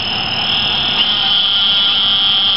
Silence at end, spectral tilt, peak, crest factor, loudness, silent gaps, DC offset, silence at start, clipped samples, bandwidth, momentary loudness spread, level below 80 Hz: 0 s; -4 dB/octave; -2 dBFS; 12 dB; -11 LUFS; none; 1%; 0 s; under 0.1%; 8.4 kHz; 4 LU; -44 dBFS